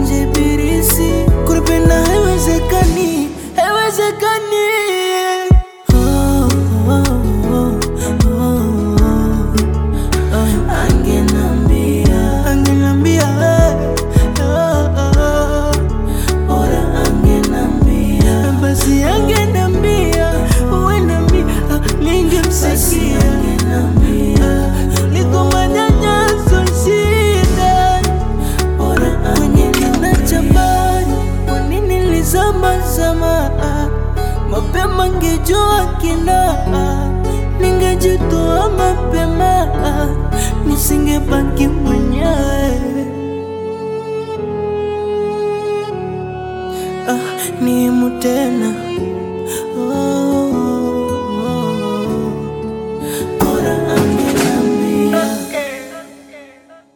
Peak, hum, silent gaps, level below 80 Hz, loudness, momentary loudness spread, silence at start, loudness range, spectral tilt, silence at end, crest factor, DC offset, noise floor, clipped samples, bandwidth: 0 dBFS; none; none; -18 dBFS; -14 LUFS; 7 LU; 0 s; 5 LU; -5.5 dB/octave; 0.5 s; 12 dB; under 0.1%; -42 dBFS; under 0.1%; 18 kHz